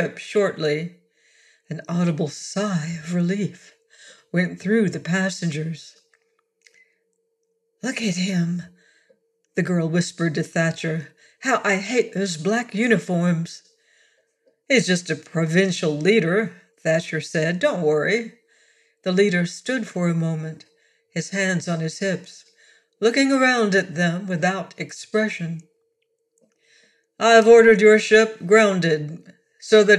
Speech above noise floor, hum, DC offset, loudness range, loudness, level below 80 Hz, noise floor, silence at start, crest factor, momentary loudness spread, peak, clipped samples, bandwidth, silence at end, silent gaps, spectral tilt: 52 dB; none; under 0.1%; 10 LU; -21 LUFS; -70 dBFS; -72 dBFS; 0 s; 18 dB; 15 LU; -4 dBFS; under 0.1%; 11.5 kHz; 0 s; none; -5 dB/octave